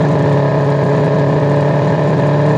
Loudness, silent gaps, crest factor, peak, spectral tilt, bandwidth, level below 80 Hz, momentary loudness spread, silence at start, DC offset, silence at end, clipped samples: -13 LUFS; none; 8 dB; -4 dBFS; -9 dB/octave; 7.6 kHz; -50 dBFS; 1 LU; 0 s; under 0.1%; 0 s; under 0.1%